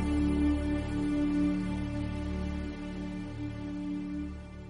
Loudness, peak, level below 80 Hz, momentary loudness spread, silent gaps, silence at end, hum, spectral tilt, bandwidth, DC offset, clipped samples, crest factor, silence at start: -33 LUFS; -18 dBFS; -40 dBFS; 10 LU; none; 0 s; none; -7.5 dB/octave; 10.5 kHz; under 0.1%; under 0.1%; 14 dB; 0 s